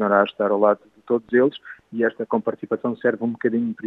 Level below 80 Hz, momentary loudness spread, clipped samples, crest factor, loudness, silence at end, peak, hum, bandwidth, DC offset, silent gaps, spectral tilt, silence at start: -72 dBFS; 7 LU; under 0.1%; 18 dB; -22 LUFS; 0 s; -2 dBFS; none; 4.1 kHz; under 0.1%; none; -8.5 dB/octave; 0 s